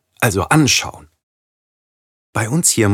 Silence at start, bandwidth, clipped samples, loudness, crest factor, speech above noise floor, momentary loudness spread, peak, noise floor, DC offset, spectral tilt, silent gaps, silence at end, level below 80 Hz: 0.2 s; 17.5 kHz; under 0.1%; -15 LUFS; 18 dB; over 75 dB; 12 LU; -2 dBFS; under -90 dBFS; under 0.1%; -3.5 dB/octave; 1.23-2.33 s; 0 s; -50 dBFS